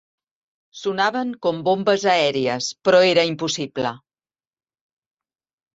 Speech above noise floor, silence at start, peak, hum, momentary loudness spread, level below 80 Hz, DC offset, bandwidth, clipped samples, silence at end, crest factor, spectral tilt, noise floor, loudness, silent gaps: over 70 dB; 0.75 s; -4 dBFS; none; 11 LU; -66 dBFS; under 0.1%; 8 kHz; under 0.1%; 1.8 s; 18 dB; -4 dB/octave; under -90 dBFS; -20 LUFS; none